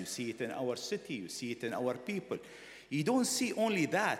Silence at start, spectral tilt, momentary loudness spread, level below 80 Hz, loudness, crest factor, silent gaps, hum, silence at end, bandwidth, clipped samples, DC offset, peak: 0 s; -4 dB/octave; 11 LU; -76 dBFS; -35 LUFS; 18 dB; none; none; 0 s; 16.5 kHz; under 0.1%; under 0.1%; -16 dBFS